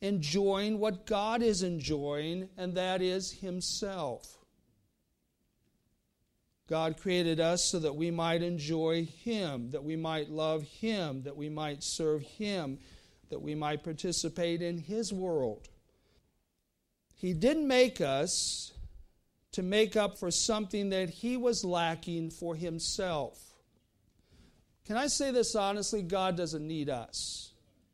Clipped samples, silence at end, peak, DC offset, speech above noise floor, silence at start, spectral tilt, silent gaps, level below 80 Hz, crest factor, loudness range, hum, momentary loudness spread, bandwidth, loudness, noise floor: under 0.1%; 0.45 s; -14 dBFS; under 0.1%; 48 dB; 0 s; -4 dB/octave; none; -58 dBFS; 20 dB; 5 LU; none; 9 LU; 15 kHz; -33 LUFS; -80 dBFS